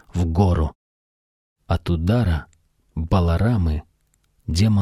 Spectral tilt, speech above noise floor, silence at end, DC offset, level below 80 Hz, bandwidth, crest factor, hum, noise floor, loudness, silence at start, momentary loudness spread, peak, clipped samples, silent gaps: -7.5 dB/octave; 46 dB; 0 s; under 0.1%; -30 dBFS; 12 kHz; 18 dB; none; -64 dBFS; -21 LUFS; 0.15 s; 11 LU; -4 dBFS; under 0.1%; 0.75-1.56 s